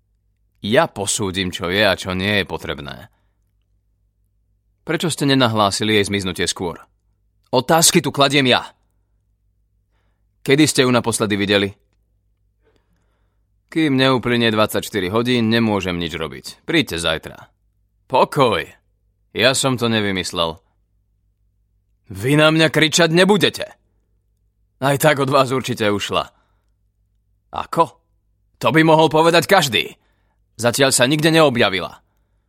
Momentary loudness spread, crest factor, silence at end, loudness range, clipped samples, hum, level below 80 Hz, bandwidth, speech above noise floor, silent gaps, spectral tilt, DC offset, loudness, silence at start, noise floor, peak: 15 LU; 20 dB; 0.55 s; 5 LU; under 0.1%; none; -52 dBFS; 16.5 kHz; 47 dB; none; -4 dB/octave; under 0.1%; -17 LUFS; 0.65 s; -64 dBFS; 0 dBFS